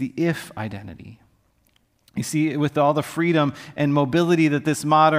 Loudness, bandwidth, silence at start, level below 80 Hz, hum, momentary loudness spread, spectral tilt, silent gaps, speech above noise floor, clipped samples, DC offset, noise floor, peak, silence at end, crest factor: -21 LUFS; 16 kHz; 0 s; -60 dBFS; none; 14 LU; -6 dB/octave; none; 43 dB; under 0.1%; under 0.1%; -64 dBFS; -4 dBFS; 0 s; 18 dB